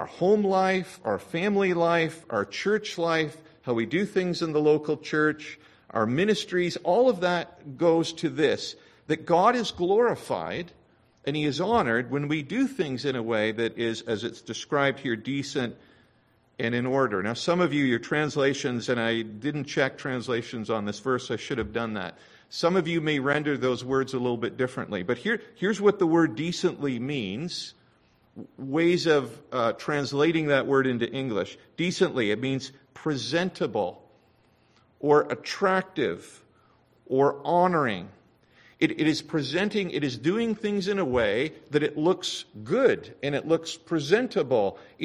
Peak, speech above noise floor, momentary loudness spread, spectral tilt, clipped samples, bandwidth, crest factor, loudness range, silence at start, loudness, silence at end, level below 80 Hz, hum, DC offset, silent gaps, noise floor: -6 dBFS; 38 dB; 9 LU; -5.5 dB/octave; under 0.1%; 12.5 kHz; 20 dB; 3 LU; 0 s; -26 LUFS; 0 s; -60 dBFS; none; under 0.1%; none; -64 dBFS